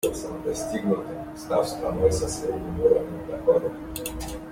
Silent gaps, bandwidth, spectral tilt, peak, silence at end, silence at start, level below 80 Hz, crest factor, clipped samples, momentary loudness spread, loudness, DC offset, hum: none; 16.5 kHz; -5.5 dB/octave; -8 dBFS; 0 s; 0.05 s; -44 dBFS; 18 dB; under 0.1%; 11 LU; -26 LUFS; under 0.1%; none